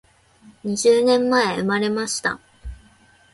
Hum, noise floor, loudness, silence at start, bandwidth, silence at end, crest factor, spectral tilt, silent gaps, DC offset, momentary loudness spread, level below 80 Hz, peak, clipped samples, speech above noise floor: none; -54 dBFS; -19 LUFS; 0.65 s; 11.5 kHz; 0.6 s; 16 dB; -3.5 dB/octave; none; under 0.1%; 22 LU; -46 dBFS; -6 dBFS; under 0.1%; 35 dB